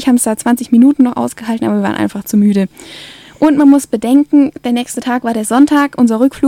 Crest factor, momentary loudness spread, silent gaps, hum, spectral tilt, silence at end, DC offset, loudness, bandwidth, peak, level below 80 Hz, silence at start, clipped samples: 12 dB; 9 LU; none; none; -5.5 dB/octave; 0 s; under 0.1%; -12 LUFS; 16 kHz; 0 dBFS; -52 dBFS; 0 s; under 0.1%